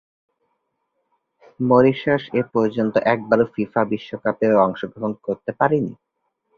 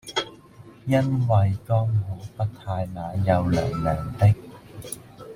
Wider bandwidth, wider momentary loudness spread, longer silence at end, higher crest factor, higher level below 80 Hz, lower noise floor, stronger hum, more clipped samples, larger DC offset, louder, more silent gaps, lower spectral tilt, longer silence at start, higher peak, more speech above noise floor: second, 6.8 kHz vs 16.5 kHz; second, 11 LU vs 16 LU; first, 0.65 s vs 0 s; about the same, 20 dB vs 18 dB; second, -60 dBFS vs -46 dBFS; first, -73 dBFS vs -47 dBFS; neither; neither; neither; first, -20 LUFS vs -24 LUFS; neither; first, -8.5 dB/octave vs -7 dB/octave; first, 1.6 s vs 0.05 s; first, -2 dBFS vs -6 dBFS; first, 54 dB vs 25 dB